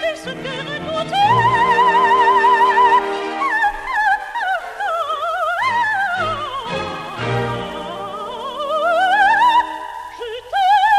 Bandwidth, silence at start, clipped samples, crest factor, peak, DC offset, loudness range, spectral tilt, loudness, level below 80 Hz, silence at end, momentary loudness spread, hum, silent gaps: 14 kHz; 0 s; under 0.1%; 14 dB; -4 dBFS; under 0.1%; 7 LU; -4 dB/octave; -17 LUFS; -48 dBFS; 0 s; 14 LU; none; none